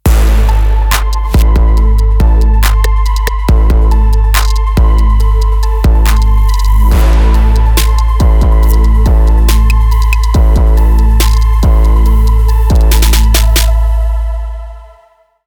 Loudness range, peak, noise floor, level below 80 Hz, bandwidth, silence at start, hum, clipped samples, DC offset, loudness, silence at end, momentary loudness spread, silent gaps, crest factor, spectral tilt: 1 LU; 0 dBFS; -47 dBFS; -8 dBFS; 19 kHz; 0.05 s; none; under 0.1%; under 0.1%; -10 LUFS; 0.6 s; 4 LU; none; 6 dB; -5.5 dB/octave